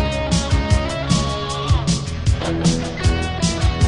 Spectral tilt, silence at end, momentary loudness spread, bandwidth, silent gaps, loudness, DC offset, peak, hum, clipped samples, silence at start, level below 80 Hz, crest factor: -5 dB/octave; 0 s; 3 LU; 11 kHz; none; -20 LUFS; under 0.1%; -2 dBFS; none; under 0.1%; 0 s; -24 dBFS; 16 dB